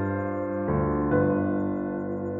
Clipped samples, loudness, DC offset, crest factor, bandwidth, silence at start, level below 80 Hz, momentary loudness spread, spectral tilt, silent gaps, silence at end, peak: under 0.1%; -27 LUFS; under 0.1%; 16 dB; 3.7 kHz; 0 s; -46 dBFS; 7 LU; -12 dB/octave; none; 0 s; -10 dBFS